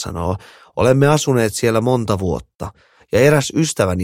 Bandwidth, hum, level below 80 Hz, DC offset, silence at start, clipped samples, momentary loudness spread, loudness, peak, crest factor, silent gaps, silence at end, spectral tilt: 16.5 kHz; none; -40 dBFS; under 0.1%; 0 s; under 0.1%; 16 LU; -16 LUFS; 0 dBFS; 16 dB; 2.55-2.59 s; 0 s; -5.5 dB/octave